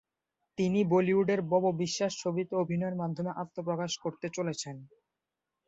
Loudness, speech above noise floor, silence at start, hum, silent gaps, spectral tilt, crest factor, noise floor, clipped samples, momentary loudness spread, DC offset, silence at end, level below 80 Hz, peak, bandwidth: -31 LUFS; 57 dB; 0.6 s; none; none; -5.5 dB/octave; 16 dB; -88 dBFS; under 0.1%; 10 LU; under 0.1%; 0.8 s; -72 dBFS; -14 dBFS; 8.2 kHz